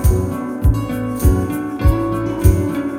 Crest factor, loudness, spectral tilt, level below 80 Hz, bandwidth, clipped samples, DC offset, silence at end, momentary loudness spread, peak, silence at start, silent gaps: 16 dB; -18 LUFS; -7.5 dB/octave; -20 dBFS; 16.5 kHz; under 0.1%; under 0.1%; 0 s; 6 LU; 0 dBFS; 0 s; none